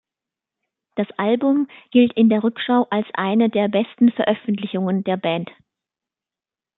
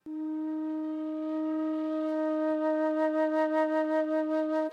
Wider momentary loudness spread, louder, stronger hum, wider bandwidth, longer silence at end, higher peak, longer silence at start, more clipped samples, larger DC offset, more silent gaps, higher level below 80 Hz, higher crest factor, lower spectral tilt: about the same, 8 LU vs 7 LU; first, -19 LUFS vs -30 LUFS; neither; second, 4.1 kHz vs 5.8 kHz; first, 1.3 s vs 0 s; first, -2 dBFS vs -18 dBFS; first, 0.95 s vs 0.05 s; neither; neither; neither; first, -68 dBFS vs -90 dBFS; first, 18 dB vs 12 dB; first, -11 dB/octave vs -5 dB/octave